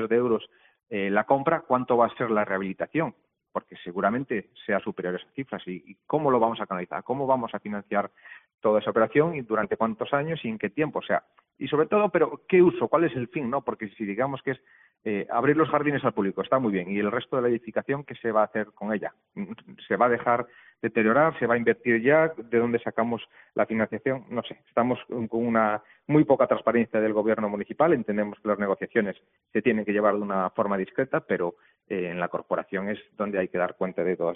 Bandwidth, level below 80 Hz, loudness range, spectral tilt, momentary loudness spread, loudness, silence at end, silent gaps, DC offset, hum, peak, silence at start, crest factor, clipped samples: 3.9 kHz; -66 dBFS; 5 LU; -5.5 dB/octave; 11 LU; -26 LUFS; 0 s; 8.54-8.58 s; under 0.1%; none; -6 dBFS; 0 s; 20 dB; under 0.1%